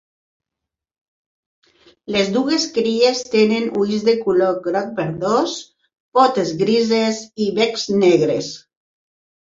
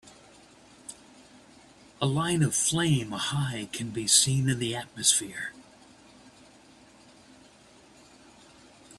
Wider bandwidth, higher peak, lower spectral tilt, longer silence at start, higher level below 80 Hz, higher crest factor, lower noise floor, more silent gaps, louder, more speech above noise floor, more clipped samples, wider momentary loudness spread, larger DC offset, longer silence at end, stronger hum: second, 7.8 kHz vs 14 kHz; first, -2 dBFS vs -6 dBFS; first, -4.5 dB/octave vs -3 dB/octave; first, 2.1 s vs 0.05 s; about the same, -60 dBFS vs -62 dBFS; second, 18 dB vs 24 dB; first, -84 dBFS vs -56 dBFS; first, 6.00-6.12 s vs none; first, -18 LUFS vs -26 LUFS; first, 66 dB vs 29 dB; neither; second, 7 LU vs 18 LU; neither; first, 0.85 s vs 0.05 s; neither